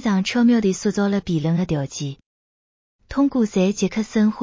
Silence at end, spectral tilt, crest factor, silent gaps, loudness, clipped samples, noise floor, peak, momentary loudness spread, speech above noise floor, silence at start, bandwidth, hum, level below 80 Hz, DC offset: 0 s; -6 dB/octave; 14 dB; 2.26-2.99 s; -20 LUFS; under 0.1%; under -90 dBFS; -8 dBFS; 10 LU; over 71 dB; 0 s; 7.6 kHz; none; -50 dBFS; under 0.1%